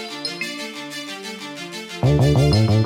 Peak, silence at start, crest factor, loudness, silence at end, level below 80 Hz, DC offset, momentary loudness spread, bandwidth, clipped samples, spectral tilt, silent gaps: -6 dBFS; 0 s; 14 dB; -21 LUFS; 0 s; -36 dBFS; under 0.1%; 15 LU; 15.5 kHz; under 0.1%; -6 dB/octave; none